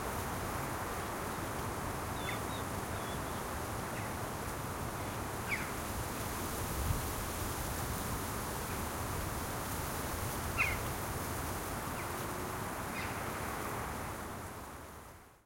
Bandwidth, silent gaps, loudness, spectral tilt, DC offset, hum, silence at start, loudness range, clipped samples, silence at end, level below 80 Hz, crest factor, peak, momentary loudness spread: 16.5 kHz; none; -38 LUFS; -4 dB/octave; under 0.1%; none; 0 s; 2 LU; under 0.1%; 0.1 s; -48 dBFS; 20 dB; -18 dBFS; 3 LU